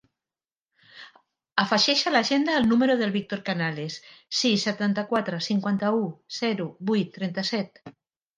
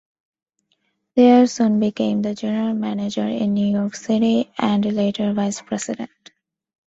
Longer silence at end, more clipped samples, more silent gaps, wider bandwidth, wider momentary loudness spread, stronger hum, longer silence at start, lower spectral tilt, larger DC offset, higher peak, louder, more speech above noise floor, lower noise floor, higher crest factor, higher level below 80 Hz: second, 0.5 s vs 0.8 s; neither; neither; first, 9.6 kHz vs 8 kHz; about the same, 9 LU vs 11 LU; neither; second, 0.95 s vs 1.15 s; second, -4.5 dB/octave vs -6 dB/octave; neither; about the same, -4 dBFS vs -2 dBFS; second, -25 LUFS vs -19 LUFS; first, over 65 dB vs 51 dB; first, under -90 dBFS vs -69 dBFS; about the same, 22 dB vs 18 dB; second, -68 dBFS vs -62 dBFS